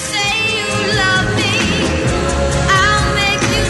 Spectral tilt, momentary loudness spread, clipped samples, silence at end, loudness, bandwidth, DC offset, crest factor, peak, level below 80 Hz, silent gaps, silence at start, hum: -3.5 dB/octave; 4 LU; under 0.1%; 0 s; -14 LUFS; 12 kHz; under 0.1%; 14 dB; 0 dBFS; -26 dBFS; none; 0 s; none